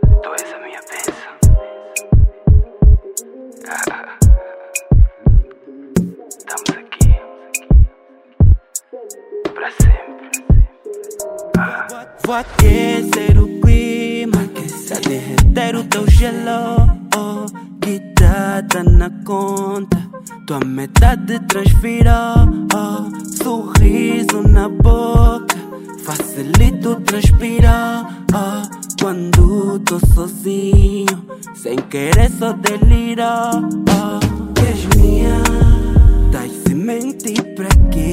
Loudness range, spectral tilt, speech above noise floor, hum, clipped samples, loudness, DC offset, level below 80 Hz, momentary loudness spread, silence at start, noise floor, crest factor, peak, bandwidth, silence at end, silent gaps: 3 LU; -6 dB/octave; 35 dB; none; 0.2%; -15 LUFS; under 0.1%; -16 dBFS; 13 LU; 0 s; -46 dBFS; 12 dB; 0 dBFS; 16.5 kHz; 0 s; none